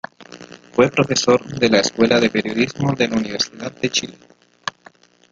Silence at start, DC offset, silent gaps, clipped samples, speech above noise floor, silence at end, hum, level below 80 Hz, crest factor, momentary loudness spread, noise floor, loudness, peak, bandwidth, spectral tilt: 0.2 s; under 0.1%; none; under 0.1%; 31 dB; 0.6 s; none; -54 dBFS; 20 dB; 15 LU; -49 dBFS; -18 LUFS; 0 dBFS; 9 kHz; -4 dB/octave